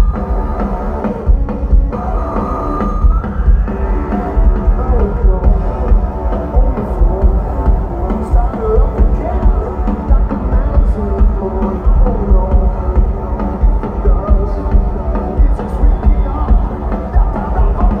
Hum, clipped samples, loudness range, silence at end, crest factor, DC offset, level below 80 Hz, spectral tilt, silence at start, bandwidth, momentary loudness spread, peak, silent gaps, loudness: none; under 0.1%; 1 LU; 0 s; 12 dB; under 0.1%; -12 dBFS; -10.5 dB/octave; 0 s; 2.9 kHz; 4 LU; 0 dBFS; none; -16 LUFS